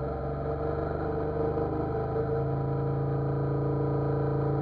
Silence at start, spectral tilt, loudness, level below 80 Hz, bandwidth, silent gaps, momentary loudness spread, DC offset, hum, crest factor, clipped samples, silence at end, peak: 0 s; -11.5 dB/octave; -30 LUFS; -42 dBFS; 4.5 kHz; none; 3 LU; under 0.1%; none; 12 dB; under 0.1%; 0 s; -18 dBFS